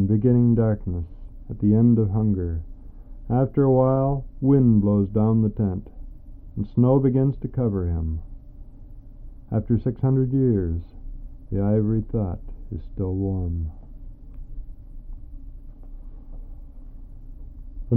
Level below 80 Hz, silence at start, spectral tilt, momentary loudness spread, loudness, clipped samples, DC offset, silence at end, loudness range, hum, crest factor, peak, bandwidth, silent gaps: -36 dBFS; 0 s; -14.5 dB/octave; 25 LU; -22 LUFS; under 0.1%; under 0.1%; 0 s; 11 LU; none; 16 dB; -8 dBFS; 2.4 kHz; none